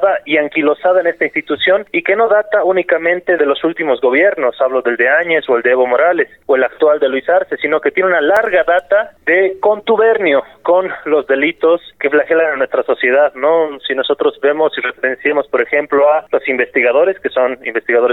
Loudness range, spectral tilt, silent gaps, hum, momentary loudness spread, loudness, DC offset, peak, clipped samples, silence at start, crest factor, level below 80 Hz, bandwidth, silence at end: 1 LU; -6 dB/octave; none; none; 4 LU; -13 LUFS; 0.1%; -2 dBFS; under 0.1%; 0 s; 12 dB; -58 dBFS; 4.1 kHz; 0 s